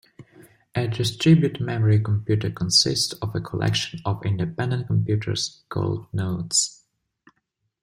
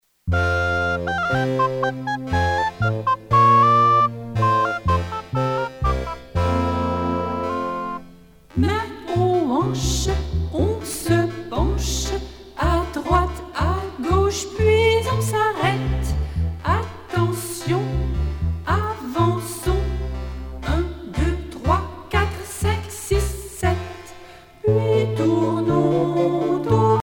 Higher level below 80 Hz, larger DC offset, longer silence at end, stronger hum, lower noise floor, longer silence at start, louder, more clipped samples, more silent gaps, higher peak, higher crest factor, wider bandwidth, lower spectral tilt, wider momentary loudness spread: second, -54 dBFS vs -30 dBFS; neither; first, 1.1 s vs 0 s; neither; first, -75 dBFS vs -46 dBFS; about the same, 0.2 s vs 0.25 s; about the same, -23 LUFS vs -21 LUFS; neither; neither; about the same, -4 dBFS vs -4 dBFS; about the same, 18 dB vs 16 dB; second, 15 kHz vs over 20 kHz; second, -4.5 dB/octave vs -6 dB/octave; about the same, 10 LU vs 8 LU